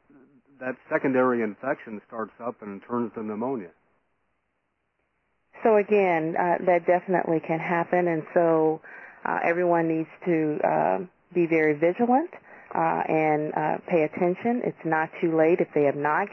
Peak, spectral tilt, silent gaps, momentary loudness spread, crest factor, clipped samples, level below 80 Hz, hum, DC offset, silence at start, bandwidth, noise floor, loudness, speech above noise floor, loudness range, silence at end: -8 dBFS; -9.5 dB/octave; none; 12 LU; 16 dB; under 0.1%; -74 dBFS; none; under 0.1%; 0.6 s; 6 kHz; -76 dBFS; -25 LUFS; 52 dB; 9 LU; 0 s